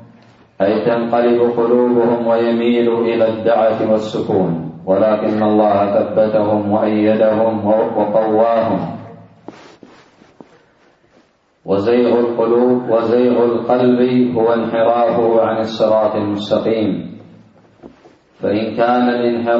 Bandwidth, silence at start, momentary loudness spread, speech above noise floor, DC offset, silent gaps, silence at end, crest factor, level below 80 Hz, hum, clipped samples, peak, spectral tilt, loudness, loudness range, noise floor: 7.4 kHz; 0 s; 5 LU; 40 dB; under 0.1%; none; 0 s; 14 dB; -58 dBFS; none; under 0.1%; -2 dBFS; -8 dB/octave; -15 LUFS; 6 LU; -54 dBFS